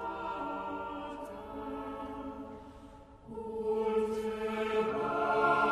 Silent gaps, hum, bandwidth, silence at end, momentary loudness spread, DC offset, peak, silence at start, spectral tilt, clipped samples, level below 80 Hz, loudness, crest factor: none; none; 13 kHz; 0 s; 17 LU; under 0.1%; -16 dBFS; 0 s; -6 dB/octave; under 0.1%; -58 dBFS; -35 LUFS; 20 dB